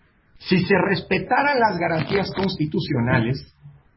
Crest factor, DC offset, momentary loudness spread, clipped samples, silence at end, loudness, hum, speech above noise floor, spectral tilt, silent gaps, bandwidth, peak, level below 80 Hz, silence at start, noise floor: 18 dB; under 0.1%; 6 LU; under 0.1%; 0.25 s; -21 LUFS; none; 20 dB; -10.5 dB/octave; none; 5.8 kHz; -2 dBFS; -48 dBFS; 0.4 s; -40 dBFS